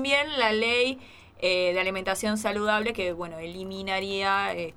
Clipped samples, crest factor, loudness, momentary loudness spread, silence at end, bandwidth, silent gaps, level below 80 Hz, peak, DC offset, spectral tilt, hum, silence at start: under 0.1%; 18 dB; -26 LUFS; 12 LU; 0.05 s; 16.5 kHz; none; -56 dBFS; -10 dBFS; under 0.1%; -3.5 dB/octave; none; 0 s